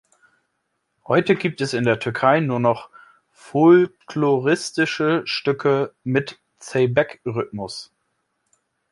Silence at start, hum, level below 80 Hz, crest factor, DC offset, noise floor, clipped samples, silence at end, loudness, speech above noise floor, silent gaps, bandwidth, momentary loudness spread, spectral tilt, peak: 1.1 s; none; -62 dBFS; 20 dB; under 0.1%; -74 dBFS; under 0.1%; 1.05 s; -20 LUFS; 54 dB; none; 11.5 kHz; 11 LU; -6 dB/octave; -2 dBFS